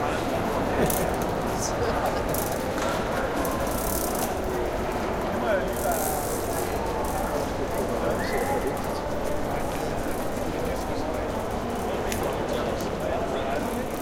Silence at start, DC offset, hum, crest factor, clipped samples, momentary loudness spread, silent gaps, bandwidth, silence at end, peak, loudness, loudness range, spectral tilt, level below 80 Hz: 0 s; under 0.1%; none; 16 dB; under 0.1%; 4 LU; none; 17 kHz; 0 s; -10 dBFS; -27 LUFS; 3 LU; -4.5 dB/octave; -38 dBFS